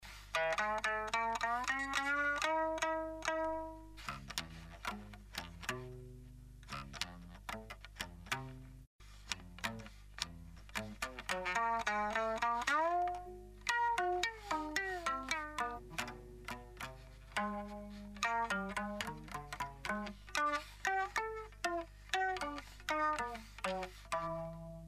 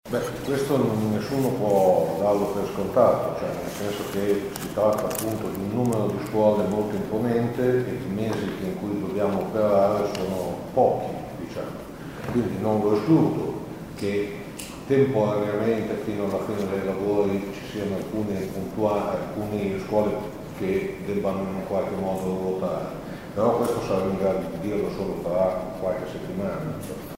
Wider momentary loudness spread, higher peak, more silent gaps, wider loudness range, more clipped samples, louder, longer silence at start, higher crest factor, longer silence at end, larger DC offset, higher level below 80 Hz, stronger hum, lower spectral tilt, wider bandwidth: first, 14 LU vs 10 LU; second, -14 dBFS vs -6 dBFS; first, 8.87-8.99 s vs none; first, 10 LU vs 4 LU; neither; second, -39 LUFS vs -25 LUFS; about the same, 0 s vs 0.05 s; first, 26 dB vs 18 dB; about the same, 0 s vs 0 s; neither; second, -58 dBFS vs -50 dBFS; first, 50 Hz at -60 dBFS vs none; second, -3 dB/octave vs -7 dB/octave; about the same, 15.5 kHz vs 16 kHz